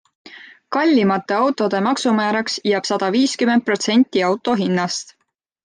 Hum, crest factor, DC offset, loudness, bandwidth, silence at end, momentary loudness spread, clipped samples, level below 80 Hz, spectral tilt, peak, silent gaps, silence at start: none; 14 dB; under 0.1%; -18 LUFS; 10 kHz; 0.55 s; 4 LU; under 0.1%; -68 dBFS; -4.5 dB/octave; -4 dBFS; none; 0.25 s